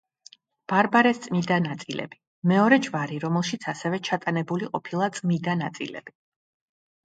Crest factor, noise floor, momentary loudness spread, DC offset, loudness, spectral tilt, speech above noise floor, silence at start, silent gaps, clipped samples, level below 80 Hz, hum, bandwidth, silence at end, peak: 22 dB; -54 dBFS; 14 LU; under 0.1%; -25 LUFS; -6 dB/octave; 30 dB; 0.7 s; 2.27-2.42 s; under 0.1%; -70 dBFS; none; 9.2 kHz; 0.95 s; -4 dBFS